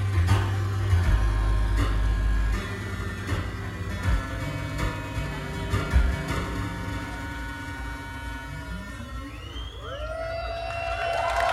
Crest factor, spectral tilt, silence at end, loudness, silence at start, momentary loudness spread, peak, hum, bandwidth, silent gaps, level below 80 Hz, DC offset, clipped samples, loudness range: 18 dB; -6 dB/octave; 0 s; -29 LUFS; 0 s; 12 LU; -10 dBFS; none; 13.5 kHz; none; -30 dBFS; under 0.1%; under 0.1%; 8 LU